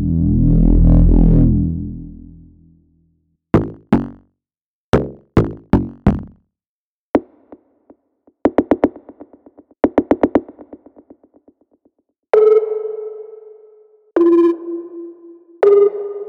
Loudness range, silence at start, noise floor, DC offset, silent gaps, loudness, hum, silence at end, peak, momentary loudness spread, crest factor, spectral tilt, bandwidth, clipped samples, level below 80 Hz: 6 LU; 0 s; under -90 dBFS; under 0.1%; 4.61-4.93 s, 6.67-7.14 s; -16 LUFS; none; 0 s; 0 dBFS; 17 LU; 16 dB; -10.5 dB/octave; 4.5 kHz; under 0.1%; -24 dBFS